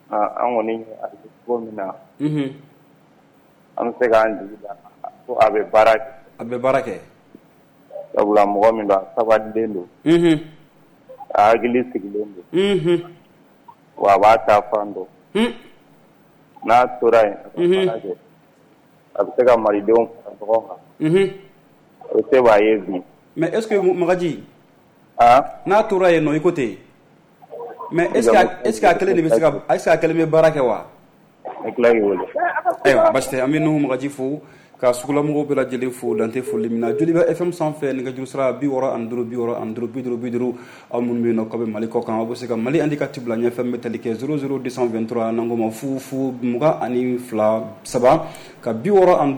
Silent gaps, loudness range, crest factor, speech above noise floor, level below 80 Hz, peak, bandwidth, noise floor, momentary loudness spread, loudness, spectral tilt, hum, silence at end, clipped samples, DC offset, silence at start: none; 5 LU; 14 dB; 35 dB; -54 dBFS; -4 dBFS; 19 kHz; -53 dBFS; 14 LU; -19 LUFS; -6 dB/octave; none; 0 s; under 0.1%; under 0.1%; 0.1 s